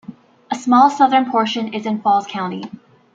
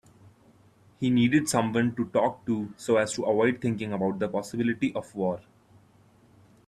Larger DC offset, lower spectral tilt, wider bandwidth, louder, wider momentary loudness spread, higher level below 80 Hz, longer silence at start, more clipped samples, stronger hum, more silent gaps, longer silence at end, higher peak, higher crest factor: neither; about the same, -5 dB/octave vs -5.5 dB/octave; second, 7.8 kHz vs 13 kHz; first, -16 LUFS vs -27 LUFS; first, 15 LU vs 8 LU; about the same, -68 dBFS vs -64 dBFS; second, 0.1 s vs 1 s; neither; neither; neither; second, 0.45 s vs 1.25 s; first, -2 dBFS vs -10 dBFS; about the same, 16 dB vs 18 dB